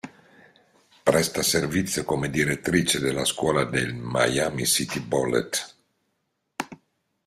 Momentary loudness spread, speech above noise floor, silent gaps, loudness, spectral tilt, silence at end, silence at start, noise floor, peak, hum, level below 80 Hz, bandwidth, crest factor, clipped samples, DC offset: 14 LU; 51 dB; none; -24 LUFS; -3.5 dB/octave; 0.5 s; 0.05 s; -76 dBFS; -4 dBFS; none; -54 dBFS; 16 kHz; 22 dB; under 0.1%; under 0.1%